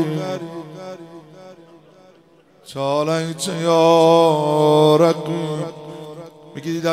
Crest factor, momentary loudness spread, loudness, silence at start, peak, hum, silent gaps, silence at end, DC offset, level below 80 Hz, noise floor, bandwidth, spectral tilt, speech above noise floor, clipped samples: 18 dB; 22 LU; -17 LUFS; 0 s; -2 dBFS; none; none; 0 s; under 0.1%; -68 dBFS; -52 dBFS; 15 kHz; -6 dB/octave; 36 dB; under 0.1%